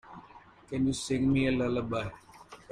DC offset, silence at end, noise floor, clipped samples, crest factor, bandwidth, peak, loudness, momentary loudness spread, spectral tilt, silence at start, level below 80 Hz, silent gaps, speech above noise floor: under 0.1%; 0.15 s; -54 dBFS; under 0.1%; 16 dB; 11 kHz; -16 dBFS; -30 LUFS; 24 LU; -6 dB/octave; 0.05 s; -54 dBFS; none; 25 dB